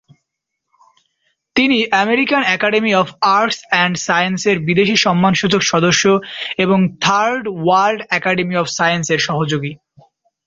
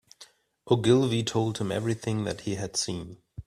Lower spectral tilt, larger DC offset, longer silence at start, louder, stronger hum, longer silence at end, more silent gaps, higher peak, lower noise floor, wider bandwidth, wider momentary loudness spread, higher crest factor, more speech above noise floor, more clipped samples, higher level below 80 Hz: second, -4 dB/octave vs -5.5 dB/octave; neither; first, 1.55 s vs 0.2 s; first, -15 LUFS vs -27 LUFS; neither; first, 0.7 s vs 0.05 s; neither; first, -2 dBFS vs -8 dBFS; first, -77 dBFS vs -55 dBFS; second, 7.8 kHz vs 13.5 kHz; second, 5 LU vs 10 LU; second, 14 dB vs 20 dB; first, 62 dB vs 29 dB; neither; about the same, -56 dBFS vs -58 dBFS